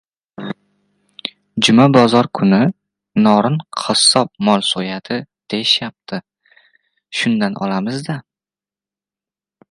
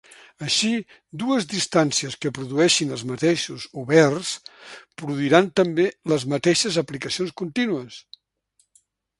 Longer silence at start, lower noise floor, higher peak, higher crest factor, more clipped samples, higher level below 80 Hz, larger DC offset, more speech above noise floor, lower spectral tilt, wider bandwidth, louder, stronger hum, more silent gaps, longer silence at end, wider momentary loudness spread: about the same, 0.4 s vs 0.4 s; first, under -90 dBFS vs -67 dBFS; about the same, 0 dBFS vs 0 dBFS; second, 18 dB vs 24 dB; neither; about the same, -60 dBFS vs -64 dBFS; neither; first, over 75 dB vs 45 dB; about the same, -4.5 dB/octave vs -4 dB/octave; about the same, 11.5 kHz vs 11.5 kHz; first, -15 LUFS vs -22 LUFS; neither; neither; first, 1.5 s vs 1.2 s; about the same, 18 LU vs 16 LU